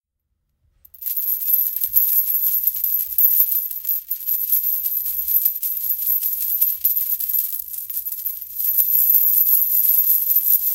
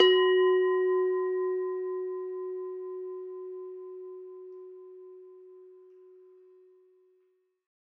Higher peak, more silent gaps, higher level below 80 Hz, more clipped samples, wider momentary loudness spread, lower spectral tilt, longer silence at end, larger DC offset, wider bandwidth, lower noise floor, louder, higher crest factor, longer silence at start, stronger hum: first, 0 dBFS vs -10 dBFS; neither; first, -62 dBFS vs under -90 dBFS; neither; second, 10 LU vs 25 LU; second, 2 dB/octave vs -3 dB/octave; second, 0 s vs 2.25 s; neither; first, 19 kHz vs 5.2 kHz; about the same, -74 dBFS vs -71 dBFS; first, -16 LUFS vs -29 LUFS; about the same, 20 dB vs 22 dB; first, 1 s vs 0 s; neither